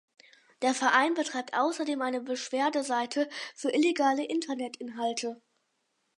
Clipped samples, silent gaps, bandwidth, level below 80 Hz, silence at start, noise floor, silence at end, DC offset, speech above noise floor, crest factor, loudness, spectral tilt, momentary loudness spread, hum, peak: under 0.1%; none; 11.5 kHz; -86 dBFS; 0.6 s; -77 dBFS; 0.85 s; under 0.1%; 48 dB; 20 dB; -29 LUFS; -2 dB/octave; 11 LU; none; -10 dBFS